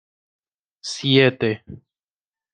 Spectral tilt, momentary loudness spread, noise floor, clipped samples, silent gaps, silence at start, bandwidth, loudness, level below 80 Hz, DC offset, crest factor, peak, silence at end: -5 dB/octave; 16 LU; under -90 dBFS; under 0.1%; none; 0.85 s; 9.6 kHz; -19 LUFS; -60 dBFS; under 0.1%; 22 dB; -2 dBFS; 0.8 s